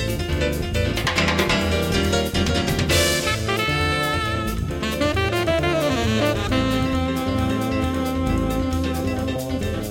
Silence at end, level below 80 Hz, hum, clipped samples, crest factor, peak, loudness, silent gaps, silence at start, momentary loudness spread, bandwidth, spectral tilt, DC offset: 0 s; -32 dBFS; none; under 0.1%; 16 dB; -6 dBFS; -21 LUFS; none; 0 s; 5 LU; 17 kHz; -5 dB/octave; under 0.1%